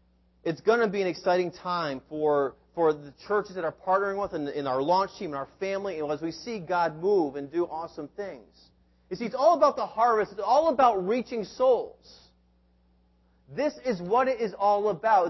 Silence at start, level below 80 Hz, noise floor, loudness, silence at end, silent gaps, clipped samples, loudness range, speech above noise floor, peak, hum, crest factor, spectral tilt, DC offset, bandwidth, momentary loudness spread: 0.45 s; -64 dBFS; -64 dBFS; -27 LUFS; 0 s; none; under 0.1%; 5 LU; 38 dB; -8 dBFS; none; 18 dB; -6 dB/octave; under 0.1%; 6.2 kHz; 12 LU